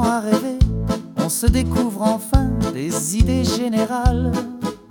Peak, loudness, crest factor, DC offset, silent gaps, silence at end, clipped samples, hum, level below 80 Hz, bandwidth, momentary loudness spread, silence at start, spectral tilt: -2 dBFS; -20 LUFS; 16 dB; under 0.1%; none; 0.15 s; under 0.1%; none; -26 dBFS; 18 kHz; 6 LU; 0 s; -5.5 dB/octave